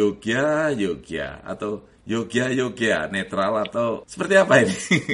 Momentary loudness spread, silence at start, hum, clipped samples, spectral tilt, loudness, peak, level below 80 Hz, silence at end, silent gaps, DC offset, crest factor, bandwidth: 13 LU; 0 s; none; under 0.1%; -5 dB/octave; -22 LUFS; -2 dBFS; -54 dBFS; 0 s; none; under 0.1%; 20 dB; 11.5 kHz